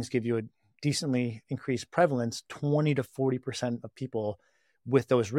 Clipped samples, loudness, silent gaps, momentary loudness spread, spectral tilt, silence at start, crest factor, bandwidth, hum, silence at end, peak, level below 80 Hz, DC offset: under 0.1%; -30 LUFS; none; 10 LU; -6 dB/octave; 0 s; 20 dB; 14.5 kHz; none; 0 s; -10 dBFS; -70 dBFS; under 0.1%